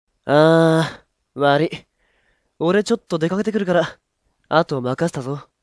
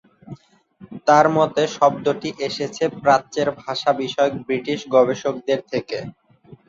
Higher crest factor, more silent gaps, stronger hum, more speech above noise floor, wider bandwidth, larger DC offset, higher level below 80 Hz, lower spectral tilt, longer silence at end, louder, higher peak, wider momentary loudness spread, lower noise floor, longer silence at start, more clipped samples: about the same, 20 dB vs 18 dB; neither; neither; first, 47 dB vs 29 dB; first, 11 kHz vs 7.8 kHz; neither; about the same, -60 dBFS vs -62 dBFS; first, -6.5 dB/octave vs -5 dB/octave; about the same, 0.2 s vs 0.15 s; about the same, -19 LUFS vs -20 LUFS; about the same, 0 dBFS vs -2 dBFS; first, 13 LU vs 10 LU; first, -64 dBFS vs -48 dBFS; about the same, 0.25 s vs 0.25 s; neither